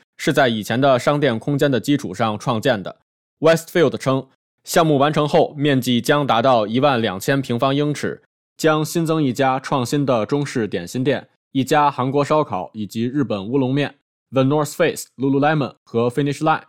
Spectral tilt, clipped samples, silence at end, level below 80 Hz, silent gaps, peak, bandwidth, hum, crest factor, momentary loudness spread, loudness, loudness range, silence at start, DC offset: -5.5 dB/octave; under 0.1%; 0.1 s; -60 dBFS; 3.02-3.37 s, 4.35-4.58 s, 8.26-8.56 s, 11.36-11.51 s, 14.02-14.26 s, 15.77-15.86 s; -2 dBFS; 16.5 kHz; none; 16 dB; 8 LU; -19 LUFS; 3 LU; 0.2 s; 0.1%